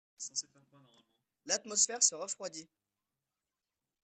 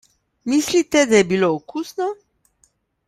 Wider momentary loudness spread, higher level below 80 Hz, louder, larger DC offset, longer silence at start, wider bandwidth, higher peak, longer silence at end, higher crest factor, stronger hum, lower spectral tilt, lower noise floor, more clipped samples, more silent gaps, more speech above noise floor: first, 23 LU vs 14 LU; second, -88 dBFS vs -58 dBFS; second, -32 LUFS vs -19 LUFS; neither; second, 0.2 s vs 0.45 s; second, 9.8 kHz vs 15.5 kHz; second, -12 dBFS vs -2 dBFS; first, 1.4 s vs 0.95 s; first, 26 dB vs 20 dB; neither; second, 1 dB/octave vs -4 dB/octave; first, under -90 dBFS vs -63 dBFS; neither; neither; first, over 55 dB vs 45 dB